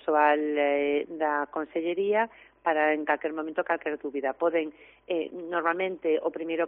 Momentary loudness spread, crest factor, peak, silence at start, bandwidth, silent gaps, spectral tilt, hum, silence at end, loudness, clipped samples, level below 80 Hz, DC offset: 7 LU; 18 dB; -10 dBFS; 0.05 s; 4.1 kHz; none; -2 dB/octave; none; 0 s; -28 LUFS; under 0.1%; -72 dBFS; under 0.1%